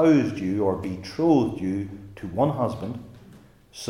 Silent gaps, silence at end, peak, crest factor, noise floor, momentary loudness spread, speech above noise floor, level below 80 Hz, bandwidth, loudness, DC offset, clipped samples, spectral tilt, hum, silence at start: none; 0 s; -8 dBFS; 16 dB; -50 dBFS; 16 LU; 27 dB; -56 dBFS; 12 kHz; -25 LUFS; under 0.1%; under 0.1%; -7.5 dB/octave; none; 0 s